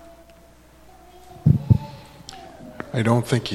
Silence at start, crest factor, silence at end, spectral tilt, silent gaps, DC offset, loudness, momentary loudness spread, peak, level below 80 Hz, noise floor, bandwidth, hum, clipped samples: 1.45 s; 22 dB; 0 s; -7 dB/octave; none; under 0.1%; -21 LUFS; 22 LU; -2 dBFS; -44 dBFS; -50 dBFS; 13 kHz; none; under 0.1%